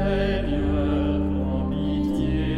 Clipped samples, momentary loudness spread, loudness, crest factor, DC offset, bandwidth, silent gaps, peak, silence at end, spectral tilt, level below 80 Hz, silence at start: under 0.1%; 2 LU; -24 LUFS; 12 dB; under 0.1%; 8.8 kHz; none; -10 dBFS; 0 s; -8.5 dB/octave; -30 dBFS; 0 s